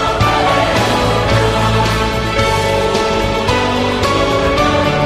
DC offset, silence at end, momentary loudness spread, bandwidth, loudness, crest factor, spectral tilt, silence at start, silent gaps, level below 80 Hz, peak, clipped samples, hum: under 0.1%; 0 s; 2 LU; 15.5 kHz; -13 LUFS; 12 dB; -5 dB/octave; 0 s; none; -26 dBFS; -2 dBFS; under 0.1%; none